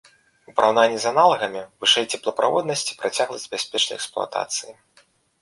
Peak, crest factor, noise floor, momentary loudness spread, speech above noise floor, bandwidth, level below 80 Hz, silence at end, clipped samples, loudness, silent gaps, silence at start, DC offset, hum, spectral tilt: -2 dBFS; 20 dB; -59 dBFS; 10 LU; 38 dB; 11.5 kHz; -68 dBFS; 0.7 s; under 0.1%; -21 LUFS; none; 0.5 s; under 0.1%; none; -1.5 dB/octave